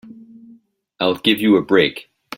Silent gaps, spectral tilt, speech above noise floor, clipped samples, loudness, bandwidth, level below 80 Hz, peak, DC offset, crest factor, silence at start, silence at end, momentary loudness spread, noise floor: none; -5.5 dB/octave; 35 dB; under 0.1%; -16 LUFS; 16.5 kHz; -58 dBFS; -2 dBFS; under 0.1%; 18 dB; 0.05 s; 0.35 s; 8 LU; -51 dBFS